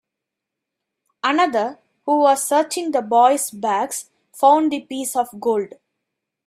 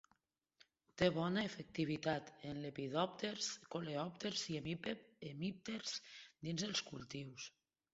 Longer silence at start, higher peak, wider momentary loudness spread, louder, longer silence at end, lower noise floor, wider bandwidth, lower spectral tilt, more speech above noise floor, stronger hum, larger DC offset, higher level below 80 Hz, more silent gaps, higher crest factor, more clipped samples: first, 1.25 s vs 0.95 s; first, -2 dBFS vs -22 dBFS; about the same, 11 LU vs 11 LU; first, -19 LUFS vs -43 LUFS; first, 0.8 s vs 0.45 s; about the same, -83 dBFS vs -81 dBFS; first, 16 kHz vs 7.6 kHz; second, -2.5 dB/octave vs -4 dB/octave; first, 65 dB vs 38 dB; neither; neither; about the same, -72 dBFS vs -72 dBFS; neither; about the same, 18 dB vs 22 dB; neither